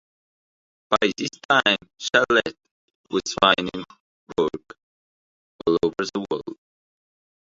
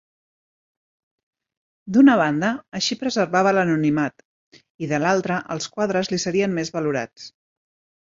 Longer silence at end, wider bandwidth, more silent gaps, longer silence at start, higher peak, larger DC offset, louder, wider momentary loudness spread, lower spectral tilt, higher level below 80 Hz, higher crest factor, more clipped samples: first, 1 s vs 0.7 s; about the same, 7.8 kHz vs 7.6 kHz; first, 1.45-1.49 s, 2.71-2.88 s, 2.95-3.04 s, 4.00-4.27 s, 4.83-5.59 s vs 4.25-4.52 s, 4.70-4.79 s; second, 0.9 s vs 1.85 s; first, 0 dBFS vs -4 dBFS; neither; about the same, -22 LUFS vs -21 LUFS; about the same, 14 LU vs 13 LU; second, -3.5 dB/octave vs -5 dB/octave; first, -58 dBFS vs -64 dBFS; first, 24 dB vs 18 dB; neither